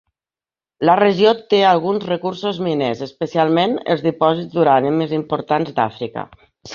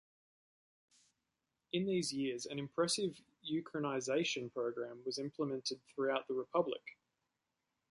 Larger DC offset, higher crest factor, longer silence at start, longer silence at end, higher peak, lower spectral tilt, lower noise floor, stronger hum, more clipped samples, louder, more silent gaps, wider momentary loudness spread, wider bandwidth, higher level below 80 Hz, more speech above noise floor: neither; about the same, 16 dB vs 20 dB; second, 0.8 s vs 1.75 s; second, 0 s vs 1 s; first, -2 dBFS vs -20 dBFS; first, -7 dB/octave vs -4 dB/octave; about the same, under -90 dBFS vs -88 dBFS; neither; neither; first, -17 LUFS vs -39 LUFS; neither; about the same, 9 LU vs 7 LU; second, 7.2 kHz vs 11.5 kHz; first, -60 dBFS vs -82 dBFS; first, over 73 dB vs 50 dB